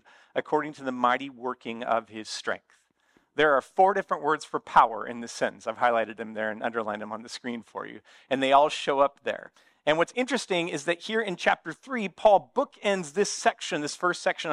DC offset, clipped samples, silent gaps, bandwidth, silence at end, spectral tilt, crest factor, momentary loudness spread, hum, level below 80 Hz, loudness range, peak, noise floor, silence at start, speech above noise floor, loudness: under 0.1%; under 0.1%; none; 11.5 kHz; 0 s; -3.5 dB/octave; 24 dB; 14 LU; none; -66 dBFS; 4 LU; -4 dBFS; -67 dBFS; 0.35 s; 40 dB; -27 LUFS